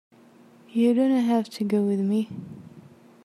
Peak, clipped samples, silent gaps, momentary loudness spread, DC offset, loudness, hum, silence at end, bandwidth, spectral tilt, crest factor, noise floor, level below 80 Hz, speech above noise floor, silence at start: -12 dBFS; under 0.1%; none; 18 LU; under 0.1%; -24 LUFS; none; 0.45 s; 13 kHz; -7.5 dB/octave; 14 dB; -53 dBFS; -72 dBFS; 30 dB; 0.75 s